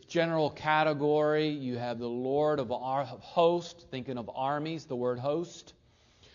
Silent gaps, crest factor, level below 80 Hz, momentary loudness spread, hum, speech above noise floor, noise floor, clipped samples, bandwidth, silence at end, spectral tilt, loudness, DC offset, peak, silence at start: none; 18 dB; -70 dBFS; 11 LU; none; 32 dB; -62 dBFS; under 0.1%; 7.4 kHz; 0.65 s; -6 dB/octave; -30 LUFS; under 0.1%; -12 dBFS; 0.1 s